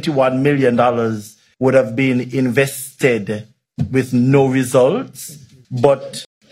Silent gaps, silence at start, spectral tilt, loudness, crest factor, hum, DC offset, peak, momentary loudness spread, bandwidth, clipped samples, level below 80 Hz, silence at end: none; 0 s; -6.5 dB/octave; -16 LUFS; 16 dB; none; under 0.1%; 0 dBFS; 15 LU; 16 kHz; under 0.1%; -54 dBFS; 0.25 s